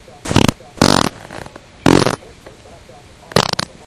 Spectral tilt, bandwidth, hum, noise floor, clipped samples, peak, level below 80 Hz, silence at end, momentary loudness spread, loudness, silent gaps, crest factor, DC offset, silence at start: -4.5 dB/octave; 17 kHz; none; -41 dBFS; 0.1%; 0 dBFS; -36 dBFS; 0.3 s; 20 LU; -15 LUFS; none; 18 dB; under 0.1%; 0.25 s